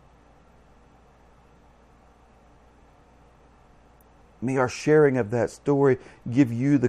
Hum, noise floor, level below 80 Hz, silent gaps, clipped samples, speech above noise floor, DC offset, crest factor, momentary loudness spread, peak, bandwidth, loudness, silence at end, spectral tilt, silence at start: none; -55 dBFS; -58 dBFS; none; under 0.1%; 33 dB; under 0.1%; 20 dB; 9 LU; -6 dBFS; 10 kHz; -23 LUFS; 0 s; -7.5 dB/octave; 4.4 s